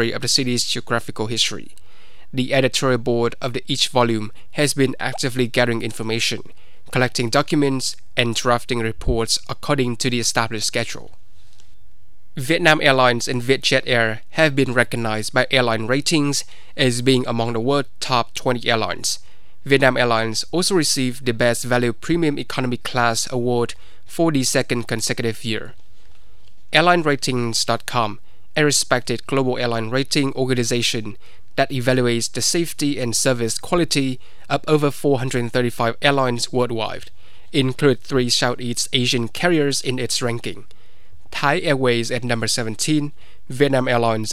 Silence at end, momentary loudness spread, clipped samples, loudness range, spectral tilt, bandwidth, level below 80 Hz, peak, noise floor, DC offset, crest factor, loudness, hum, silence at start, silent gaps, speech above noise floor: 0 s; 8 LU; under 0.1%; 3 LU; -4 dB/octave; 16 kHz; -44 dBFS; 0 dBFS; -52 dBFS; 4%; 20 dB; -20 LUFS; none; 0 s; none; 32 dB